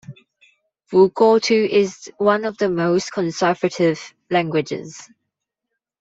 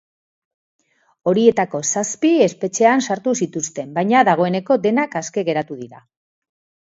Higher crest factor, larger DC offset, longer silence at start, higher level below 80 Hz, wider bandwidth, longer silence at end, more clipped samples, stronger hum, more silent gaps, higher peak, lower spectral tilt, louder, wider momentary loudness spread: about the same, 18 dB vs 18 dB; neither; second, 0.1 s vs 1.25 s; about the same, -64 dBFS vs -68 dBFS; about the same, 8 kHz vs 8 kHz; about the same, 0.95 s vs 0.9 s; neither; neither; neither; about the same, -2 dBFS vs 0 dBFS; about the same, -5.5 dB/octave vs -4.5 dB/octave; about the same, -19 LUFS vs -18 LUFS; first, 13 LU vs 9 LU